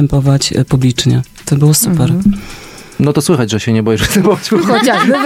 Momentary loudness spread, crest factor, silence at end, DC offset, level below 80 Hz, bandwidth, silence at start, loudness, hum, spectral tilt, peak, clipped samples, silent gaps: 7 LU; 12 dB; 0 s; under 0.1%; -32 dBFS; 16 kHz; 0 s; -11 LUFS; none; -5.5 dB/octave; 0 dBFS; under 0.1%; none